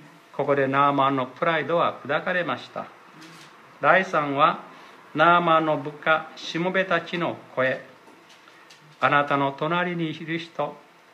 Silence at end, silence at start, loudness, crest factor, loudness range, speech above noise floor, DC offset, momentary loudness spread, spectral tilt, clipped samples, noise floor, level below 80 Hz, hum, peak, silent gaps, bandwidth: 0.35 s; 0.05 s; -23 LUFS; 22 dB; 5 LU; 28 dB; under 0.1%; 12 LU; -6 dB/octave; under 0.1%; -51 dBFS; -78 dBFS; none; -4 dBFS; none; 12 kHz